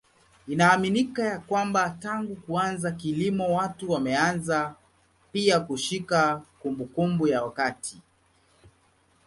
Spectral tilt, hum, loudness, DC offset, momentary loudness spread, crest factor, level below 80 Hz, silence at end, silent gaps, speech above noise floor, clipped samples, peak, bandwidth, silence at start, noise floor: -5 dB/octave; none; -26 LUFS; under 0.1%; 10 LU; 20 dB; -62 dBFS; 1.25 s; none; 38 dB; under 0.1%; -6 dBFS; 11.5 kHz; 0.45 s; -64 dBFS